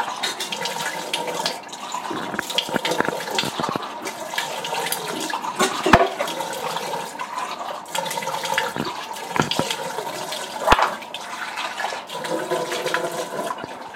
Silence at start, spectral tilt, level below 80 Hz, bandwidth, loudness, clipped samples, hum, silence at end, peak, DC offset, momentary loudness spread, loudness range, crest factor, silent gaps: 0 s; -2.5 dB/octave; -44 dBFS; 17 kHz; -24 LUFS; under 0.1%; none; 0 s; 0 dBFS; under 0.1%; 10 LU; 3 LU; 24 dB; none